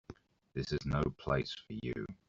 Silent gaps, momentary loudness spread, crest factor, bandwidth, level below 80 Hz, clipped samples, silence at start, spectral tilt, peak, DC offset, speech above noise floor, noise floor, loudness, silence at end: none; 13 LU; 20 dB; 7.6 kHz; -52 dBFS; under 0.1%; 0.1 s; -5.5 dB/octave; -18 dBFS; under 0.1%; 19 dB; -56 dBFS; -38 LUFS; 0.15 s